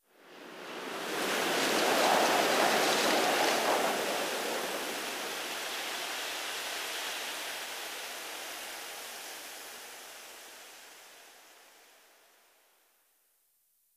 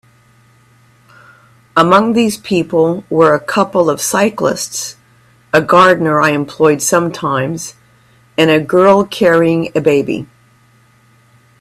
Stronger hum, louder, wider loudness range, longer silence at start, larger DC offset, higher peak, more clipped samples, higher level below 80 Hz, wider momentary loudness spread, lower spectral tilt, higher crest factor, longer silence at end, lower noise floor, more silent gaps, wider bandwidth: neither; second, -31 LUFS vs -12 LUFS; first, 19 LU vs 2 LU; second, 0.25 s vs 1.75 s; neither; second, -14 dBFS vs 0 dBFS; neither; second, -78 dBFS vs -54 dBFS; first, 21 LU vs 11 LU; second, -1 dB/octave vs -4.5 dB/octave; first, 20 dB vs 14 dB; first, 2.3 s vs 1.35 s; first, -72 dBFS vs -49 dBFS; neither; about the same, 16 kHz vs 16 kHz